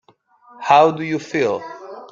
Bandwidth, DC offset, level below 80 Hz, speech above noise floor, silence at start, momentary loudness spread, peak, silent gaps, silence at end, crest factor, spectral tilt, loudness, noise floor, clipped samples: 7.6 kHz; under 0.1%; -64 dBFS; 36 dB; 0.6 s; 19 LU; -2 dBFS; none; 0.05 s; 18 dB; -5.5 dB/octave; -17 LUFS; -52 dBFS; under 0.1%